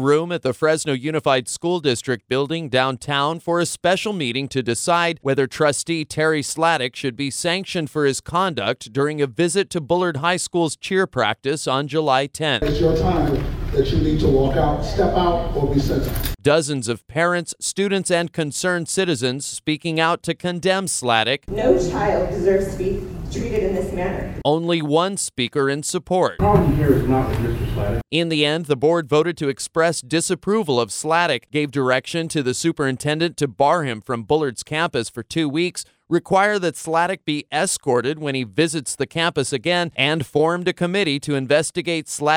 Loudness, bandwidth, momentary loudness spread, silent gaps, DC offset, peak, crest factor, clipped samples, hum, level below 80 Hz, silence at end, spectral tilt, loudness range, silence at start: -20 LUFS; 17 kHz; 6 LU; none; under 0.1%; -2 dBFS; 18 dB; under 0.1%; none; -36 dBFS; 0 s; -4.5 dB/octave; 2 LU; 0 s